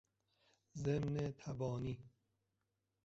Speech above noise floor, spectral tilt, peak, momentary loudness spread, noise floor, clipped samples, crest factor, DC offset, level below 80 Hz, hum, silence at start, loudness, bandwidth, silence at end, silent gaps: 46 dB; -8 dB/octave; -26 dBFS; 11 LU; -87 dBFS; under 0.1%; 18 dB; under 0.1%; -66 dBFS; none; 0.75 s; -43 LUFS; 7.8 kHz; 0.95 s; none